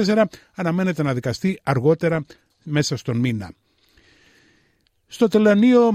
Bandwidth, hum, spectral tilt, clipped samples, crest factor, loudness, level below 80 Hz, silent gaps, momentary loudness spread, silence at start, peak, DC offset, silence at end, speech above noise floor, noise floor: 15 kHz; none; -6.5 dB/octave; under 0.1%; 16 dB; -20 LUFS; -58 dBFS; none; 15 LU; 0 s; -4 dBFS; under 0.1%; 0 s; 45 dB; -64 dBFS